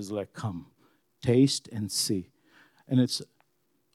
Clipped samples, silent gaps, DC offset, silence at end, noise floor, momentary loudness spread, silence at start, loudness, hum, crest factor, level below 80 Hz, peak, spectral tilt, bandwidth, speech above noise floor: under 0.1%; none; under 0.1%; 0.7 s; -74 dBFS; 13 LU; 0 s; -28 LUFS; none; 20 dB; -70 dBFS; -10 dBFS; -5 dB/octave; 14.5 kHz; 46 dB